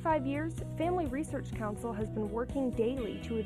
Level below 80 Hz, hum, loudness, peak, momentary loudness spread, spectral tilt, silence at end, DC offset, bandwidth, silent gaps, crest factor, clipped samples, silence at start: -48 dBFS; none; -35 LUFS; -18 dBFS; 6 LU; -7 dB/octave; 0 s; under 0.1%; 13.5 kHz; none; 16 dB; under 0.1%; 0 s